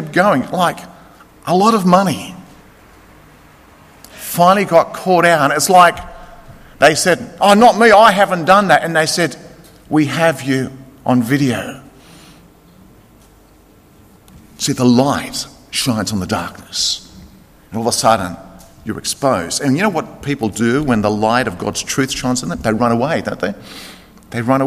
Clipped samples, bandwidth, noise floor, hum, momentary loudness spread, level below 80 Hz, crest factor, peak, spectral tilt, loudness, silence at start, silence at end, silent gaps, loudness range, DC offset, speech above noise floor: under 0.1%; 15.5 kHz; -47 dBFS; none; 16 LU; -46 dBFS; 16 dB; 0 dBFS; -4.5 dB/octave; -14 LUFS; 0 s; 0 s; none; 9 LU; under 0.1%; 33 dB